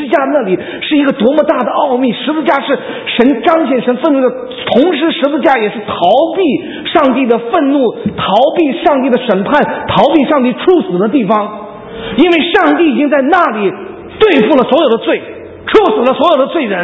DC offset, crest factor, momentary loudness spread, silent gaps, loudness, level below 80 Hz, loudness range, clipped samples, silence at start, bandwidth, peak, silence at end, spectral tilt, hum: under 0.1%; 10 dB; 7 LU; none; -11 LUFS; -46 dBFS; 1 LU; 0.4%; 0 s; 7.6 kHz; 0 dBFS; 0 s; -7.5 dB/octave; none